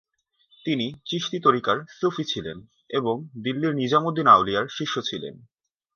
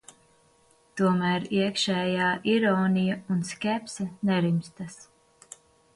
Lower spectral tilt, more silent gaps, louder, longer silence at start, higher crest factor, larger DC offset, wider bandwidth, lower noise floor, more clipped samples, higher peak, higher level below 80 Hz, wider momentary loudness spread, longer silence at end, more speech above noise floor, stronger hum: about the same, -5.5 dB/octave vs -5.5 dB/octave; neither; first, -23 LUFS vs -26 LUFS; second, 0.65 s vs 0.95 s; first, 22 dB vs 16 dB; neither; second, 7 kHz vs 11.5 kHz; about the same, -64 dBFS vs -62 dBFS; neither; first, -2 dBFS vs -12 dBFS; about the same, -62 dBFS vs -66 dBFS; second, 14 LU vs 18 LU; second, 0.6 s vs 0.95 s; first, 40 dB vs 36 dB; neither